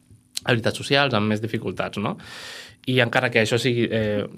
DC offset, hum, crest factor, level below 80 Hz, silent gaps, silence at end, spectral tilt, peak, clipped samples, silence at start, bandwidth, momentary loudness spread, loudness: under 0.1%; none; 22 dB; -58 dBFS; none; 0 s; -5 dB/octave; -2 dBFS; under 0.1%; 0.35 s; 15.5 kHz; 15 LU; -22 LUFS